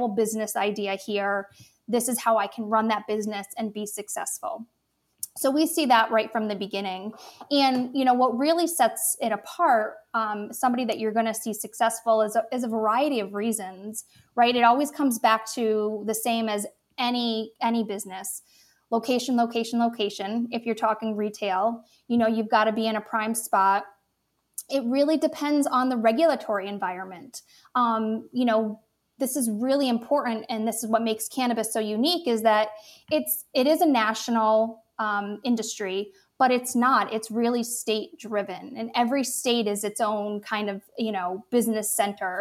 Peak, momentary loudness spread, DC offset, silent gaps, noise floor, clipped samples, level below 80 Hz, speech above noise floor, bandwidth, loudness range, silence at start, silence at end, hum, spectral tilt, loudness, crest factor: -6 dBFS; 10 LU; under 0.1%; none; -74 dBFS; under 0.1%; -78 dBFS; 49 dB; 16.5 kHz; 4 LU; 0 s; 0 s; none; -3.5 dB/octave; -25 LUFS; 20 dB